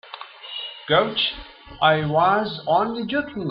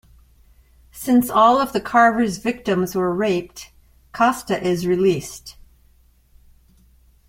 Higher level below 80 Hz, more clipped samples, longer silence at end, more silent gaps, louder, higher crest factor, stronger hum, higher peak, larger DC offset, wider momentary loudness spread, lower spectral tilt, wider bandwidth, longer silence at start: about the same, -52 dBFS vs -50 dBFS; neither; second, 0 s vs 1.75 s; neither; about the same, -21 LUFS vs -19 LUFS; about the same, 18 dB vs 18 dB; neither; about the same, -4 dBFS vs -2 dBFS; neither; about the same, 18 LU vs 18 LU; first, -8.5 dB/octave vs -5.5 dB/octave; second, 5.6 kHz vs 16.5 kHz; second, 0.05 s vs 0.95 s